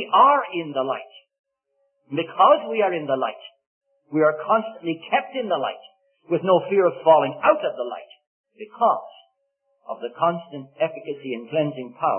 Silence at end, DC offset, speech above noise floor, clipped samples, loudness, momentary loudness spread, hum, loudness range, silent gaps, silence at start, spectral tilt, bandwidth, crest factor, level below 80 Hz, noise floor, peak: 0 s; under 0.1%; 50 dB; under 0.1%; -22 LUFS; 16 LU; none; 6 LU; 1.39-1.44 s, 3.67-3.81 s, 8.27-8.44 s; 0 s; -10 dB/octave; 3.4 kHz; 20 dB; -82 dBFS; -72 dBFS; -2 dBFS